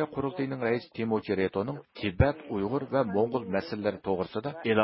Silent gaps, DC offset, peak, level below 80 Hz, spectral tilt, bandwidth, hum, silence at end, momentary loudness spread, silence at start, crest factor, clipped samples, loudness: none; under 0.1%; -10 dBFS; -44 dBFS; -11 dB/octave; 5.8 kHz; none; 0 s; 6 LU; 0 s; 18 dB; under 0.1%; -30 LUFS